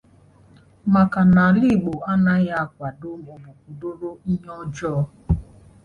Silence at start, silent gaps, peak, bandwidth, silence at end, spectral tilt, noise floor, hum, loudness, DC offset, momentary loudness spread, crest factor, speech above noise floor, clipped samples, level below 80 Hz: 0.85 s; none; -6 dBFS; 6.8 kHz; 0.4 s; -8.5 dB/octave; -52 dBFS; none; -20 LUFS; under 0.1%; 18 LU; 16 dB; 32 dB; under 0.1%; -40 dBFS